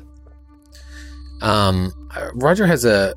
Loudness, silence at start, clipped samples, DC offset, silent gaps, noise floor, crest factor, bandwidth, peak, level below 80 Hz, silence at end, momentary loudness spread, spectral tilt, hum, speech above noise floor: -18 LUFS; 0.75 s; under 0.1%; under 0.1%; none; -45 dBFS; 18 dB; 16.5 kHz; -2 dBFS; -38 dBFS; 0 s; 23 LU; -5.5 dB/octave; none; 29 dB